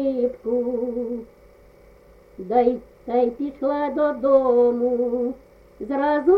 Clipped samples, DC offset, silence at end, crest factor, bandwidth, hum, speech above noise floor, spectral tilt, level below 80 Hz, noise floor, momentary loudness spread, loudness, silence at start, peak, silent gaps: under 0.1%; under 0.1%; 0 s; 16 dB; 4.9 kHz; none; 29 dB; -8 dB/octave; -54 dBFS; -50 dBFS; 13 LU; -22 LUFS; 0 s; -6 dBFS; none